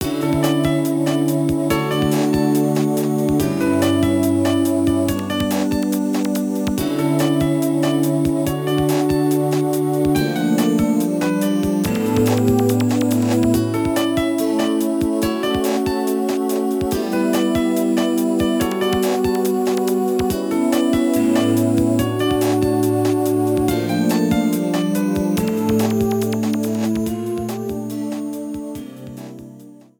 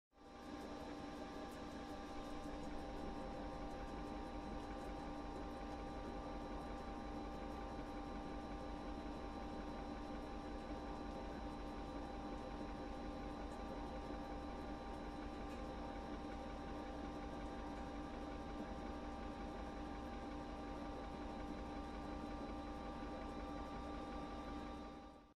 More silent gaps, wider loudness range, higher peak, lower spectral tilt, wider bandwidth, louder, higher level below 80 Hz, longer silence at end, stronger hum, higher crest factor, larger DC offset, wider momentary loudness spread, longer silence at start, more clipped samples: neither; about the same, 2 LU vs 0 LU; first, -4 dBFS vs -36 dBFS; about the same, -6 dB/octave vs -6.5 dB/octave; first, 19 kHz vs 13 kHz; first, -18 LUFS vs -50 LUFS; first, -42 dBFS vs -54 dBFS; first, 0.25 s vs 0 s; neither; about the same, 14 dB vs 12 dB; neither; first, 4 LU vs 1 LU; second, 0 s vs 0.15 s; neither